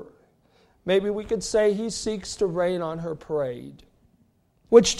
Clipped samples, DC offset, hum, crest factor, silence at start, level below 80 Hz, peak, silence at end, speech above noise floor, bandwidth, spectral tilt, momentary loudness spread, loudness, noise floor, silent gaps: under 0.1%; under 0.1%; none; 22 dB; 0 s; -52 dBFS; -2 dBFS; 0 s; 41 dB; 12 kHz; -4 dB/octave; 12 LU; -25 LUFS; -64 dBFS; none